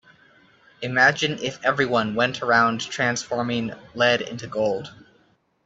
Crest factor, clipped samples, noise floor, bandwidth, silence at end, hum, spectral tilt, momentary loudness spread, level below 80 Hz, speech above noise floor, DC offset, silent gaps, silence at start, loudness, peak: 20 dB; under 0.1%; -62 dBFS; 8.2 kHz; 0.7 s; none; -4 dB/octave; 11 LU; -62 dBFS; 40 dB; under 0.1%; none; 0.8 s; -22 LUFS; -4 dBFS